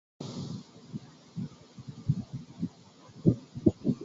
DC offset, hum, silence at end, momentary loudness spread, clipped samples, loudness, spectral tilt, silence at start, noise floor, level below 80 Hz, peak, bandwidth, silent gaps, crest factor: under 0.1%; none; 0 s; 16 LU; under 0.1%; -33 LUFS; -8.5 dB/octave; 0.2 s; -54 dBFS; -54 dBFS; -8 dBFS; 7.8 kHz; none; 26 dB